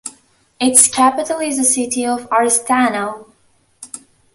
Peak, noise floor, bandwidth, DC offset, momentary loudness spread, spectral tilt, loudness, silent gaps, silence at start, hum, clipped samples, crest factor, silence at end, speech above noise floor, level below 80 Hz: 0 dBFS; -57 dBFS; 16 kHz; under 0.1%; 23 LU; -1.5 dB/octave; -14 LUFS; none; 0.05 s; none; under 0.1%; 18 dB; 0.35 s; 42 dB; -60 dBFS